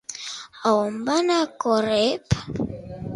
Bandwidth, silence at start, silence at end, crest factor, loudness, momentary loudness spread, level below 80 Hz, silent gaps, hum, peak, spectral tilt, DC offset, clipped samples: 11.5 kHz; 0.1 s; 0 s; 18 dB; -23 LUFS; 12 LU; -46 dBFS; none; none; -6 dBFS; -5 dB/octave; under 0.1%; under 0.1%